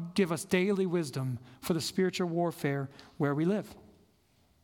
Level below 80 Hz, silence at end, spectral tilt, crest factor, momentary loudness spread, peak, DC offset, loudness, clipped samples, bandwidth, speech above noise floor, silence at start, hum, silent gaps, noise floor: -68 dBFS; 0.85 s; -6 dB/octave; 18 dB; 8 LU; -14 dBFS; under 0.1%; -32 LUFS; under 0.1%; 18 kHz; 37 dB; 0 s; none; none; -68 dBFS